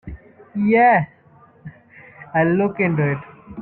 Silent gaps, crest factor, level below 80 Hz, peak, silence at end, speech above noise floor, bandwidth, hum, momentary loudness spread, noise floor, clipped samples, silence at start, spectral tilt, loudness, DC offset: none; 16 dB; -50 dBFS; -4 dBFS; 0 s; 34 dB; 4.3 kHz; none; 18 LU; -51 dBFS; under 0.1%; 0.05 s; -11.5 dB/octave; -18 LUFS; under 0.1%